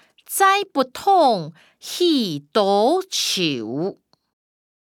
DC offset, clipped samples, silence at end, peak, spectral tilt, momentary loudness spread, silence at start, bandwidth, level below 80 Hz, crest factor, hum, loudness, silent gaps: under 0.1%; under 0.1%; 1 s; -4 dBFS; -3.5 dB/octave; 11 LU; 0.3 s; 19 kHz; -72 dBFS; 18 dB; none; -19 LUFS; none